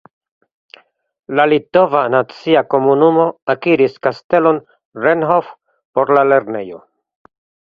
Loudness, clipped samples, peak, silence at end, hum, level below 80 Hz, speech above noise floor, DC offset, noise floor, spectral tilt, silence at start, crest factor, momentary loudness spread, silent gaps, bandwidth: -14 LUFS; under 0.1%; 0 dBFS; 0.9 s; none; -62 dBFS; 32 dB; under 0.1%; -46 dBFS; -8 dB/octave; 1.3 s; 16 dB; 9 LU; 3.42-3.47 s, 4.24-4.30 s, 4.85-4.92 s, 5.85-5.93 s; 6.2 kHz